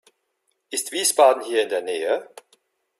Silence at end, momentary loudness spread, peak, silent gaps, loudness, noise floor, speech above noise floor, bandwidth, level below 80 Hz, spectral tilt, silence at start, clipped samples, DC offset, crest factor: 0.75 s; 11 LU; -2 dBFS; none; -21 LUFS; -73 dBFS; 53 dB; 15.5 kHz; -76 dBFS; 0 dB/octave; 0.7 s; under 0.1%; under 0.1%; 20 dB